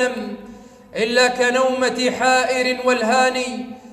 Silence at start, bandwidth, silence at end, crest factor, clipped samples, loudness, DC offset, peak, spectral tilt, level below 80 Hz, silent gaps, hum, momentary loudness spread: 0 s; 13.5 kHz; 0 s; 16 dB; under 0.1%; -18 LUFS; under 0.1%; -4 dBFS; -2.5 dB/octave; -58 dBFS; none; none; 15 LU